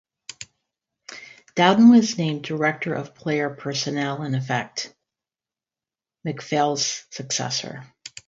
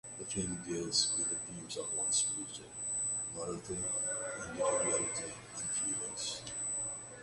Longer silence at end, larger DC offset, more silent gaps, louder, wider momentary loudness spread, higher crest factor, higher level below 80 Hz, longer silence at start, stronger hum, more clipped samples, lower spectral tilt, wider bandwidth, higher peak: first, 0.2 s vs 0 s; neither; neither; first, -22 LUFS vs -35 LUFS; first, 24 LU vs 10 LU; about the same, 22 dB vs 20 dB; about the same, -68 dBFS vs -64 dBFS; first, 0.4 s vs 0.05 s; neither; neither; first, -4.5 dB/octave vs -1.5 dB/octave; second, 7.8 kHz vs 11.5 kHz; first, -2 dBFS vs -18 dBFS